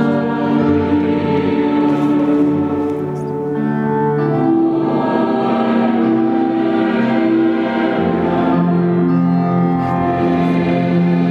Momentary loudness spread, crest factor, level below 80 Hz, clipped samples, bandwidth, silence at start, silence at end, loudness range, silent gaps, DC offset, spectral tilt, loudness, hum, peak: 3 LU; 12 dB; -50 dBFS; under 0.1%; 5.6 kHz; 0 s; 0 s; 1 LU; none; under 0.1%; -9.5 dB/octave; -15 LUFS; none; -2 dBFS